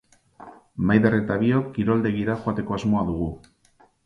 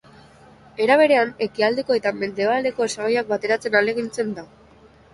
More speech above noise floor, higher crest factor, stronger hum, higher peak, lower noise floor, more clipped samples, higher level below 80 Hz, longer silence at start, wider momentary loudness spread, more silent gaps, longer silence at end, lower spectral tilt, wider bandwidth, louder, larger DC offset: first, 37 dB vs 30 dB; about the same, 20 dB vs 18 dB; neither; about the same, -4 dBFS vs -2 dBFS; first, -59 dBFS vs -50 dBFS; neither; first, -46 dBFS vs -60 dBFS; second, 0.4 s vs 0.8 s; about the same, 10 LU vs 10 LU; neither; about the same, 0.7 s vs 0.7 s; first, -8.5 dB/octave vs -4 dB/octave; second, 7.4 kHz vs 11.5 kHz; about the same, -23 LUFS vs -21 LUFS; neither